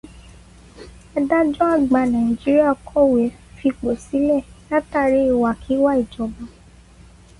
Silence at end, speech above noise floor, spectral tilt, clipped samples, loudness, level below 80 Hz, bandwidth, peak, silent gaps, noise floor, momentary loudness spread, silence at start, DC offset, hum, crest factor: 0.9 s; 28 dB; -7 dB/octave; under 0.1%; -19 LUFS; -44 dBFS; 11.5 kHz; -4 dBFS; none; -46 dBFS; 9 LU; 0.15 s; under 0.1%; none; 14 dB